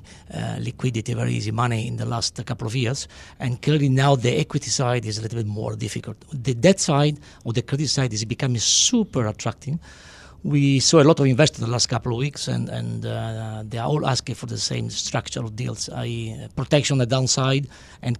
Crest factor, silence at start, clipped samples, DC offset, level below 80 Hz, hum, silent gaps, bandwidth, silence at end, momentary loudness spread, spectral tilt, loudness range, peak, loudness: 20 dB; 0.1 s; under 0.1%; under 0.1%; -50 dBFS; none; none; 12 kHz; 0 s; 13 LU; -4.5 dB/octave; 6 LU; -4 dBFS; -22 LUFS